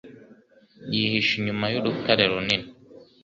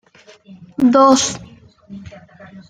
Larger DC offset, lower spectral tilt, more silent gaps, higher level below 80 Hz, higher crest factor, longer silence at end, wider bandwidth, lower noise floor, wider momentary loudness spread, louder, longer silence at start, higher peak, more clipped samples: neither; first, -5.5 dB/octave vs -3.5 dB/octave; neither; about the same, -58 dBFS vs -54 dBFS; first, 22 dB vs 16 dB; about the same, 0.2 s vs 0.1 s; second, 7.6 kHz vs 9.6 kHz; first, -54 dBFS vs -41 dBFS; second, 8 LU vs 25 LU; second, -23 LUFS vs -13 LUFS; second, 0.05 s vs 0.8 s; about the same, -4 dBFS vs -2 dBFS; neither